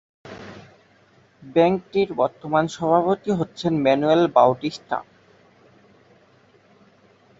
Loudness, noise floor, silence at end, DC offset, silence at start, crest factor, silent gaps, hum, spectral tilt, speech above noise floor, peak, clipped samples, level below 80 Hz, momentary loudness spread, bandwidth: -21 LUFS; -56 dBFS; 2.35 s; under 0.1%; 0.25 s; 20 dB; none; none; -6.5 dB/octave; 36 dB; -2 dBFS; under 0.1%; -62 dBFS; 20 LU; 7.8 kHz